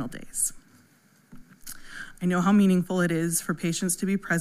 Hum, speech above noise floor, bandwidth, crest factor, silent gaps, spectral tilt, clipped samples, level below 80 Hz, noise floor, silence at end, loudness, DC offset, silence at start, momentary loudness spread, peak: none; 36 dB; 16 kHz; 16 dB; none; -5 dB/octave; under 0.1%; -54 dBFS; -60 dBFS; 0 s; -25 LUFS; under 0.1%; 0 s; 20 LU; -12 dBFS